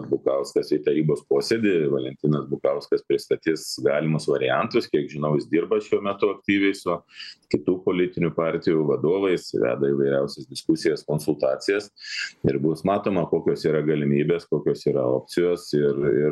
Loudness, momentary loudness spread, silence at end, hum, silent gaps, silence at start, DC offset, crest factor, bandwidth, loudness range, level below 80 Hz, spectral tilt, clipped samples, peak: -23 LUFS; 4 LU; 0 s; none; none; 0 s; under 0.1%; 16 dB; 12.5 kHz; 1 LU; -60 dBFS; -6.5 dB/octave; under 0.1%; -6 dBFS